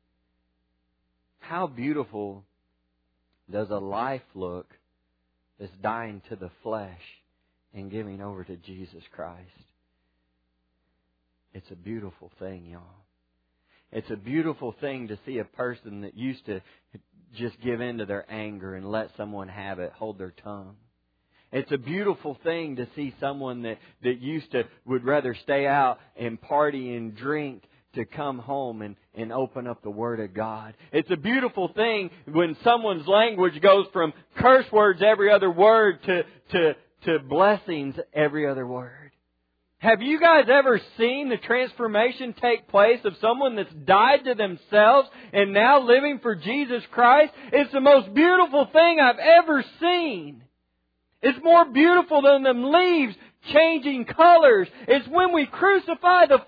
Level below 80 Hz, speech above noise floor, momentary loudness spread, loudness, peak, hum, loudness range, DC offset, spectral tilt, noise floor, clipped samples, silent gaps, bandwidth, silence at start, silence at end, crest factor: -64 dBFS; 52 dB; 20 LU; -21 LUFS; -4 dBFS; none; 17 LU; under 0.1%; -8 dB/octave; -74 dBFS; under 0.1%; none; 5 kHz; 1.45 s; 0.05 s; 18 dB